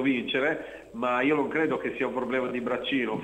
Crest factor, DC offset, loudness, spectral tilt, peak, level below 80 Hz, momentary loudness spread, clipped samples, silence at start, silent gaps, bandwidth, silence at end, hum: 14 dB; under 0.1%; -28 LUFS; -6 dB/octave; -12 dBFS; -62 dBFS; 6 LU; under 0.1%; 0 s; none; 9 kHz; 0 s; none